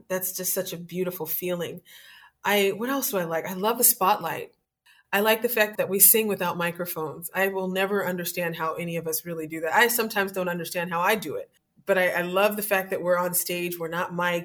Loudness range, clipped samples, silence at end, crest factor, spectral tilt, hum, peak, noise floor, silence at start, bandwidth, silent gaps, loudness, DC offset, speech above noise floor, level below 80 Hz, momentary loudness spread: 6 LU; under 0.1%; 0 s; 22 dB; -3 dB/octave; none; -4 dBFS; -61 dBFS; 0.1 s; over 20 kHz; none; -24 LUFS; under 0.1%; 36 dB; -72 dBFS; 11 LU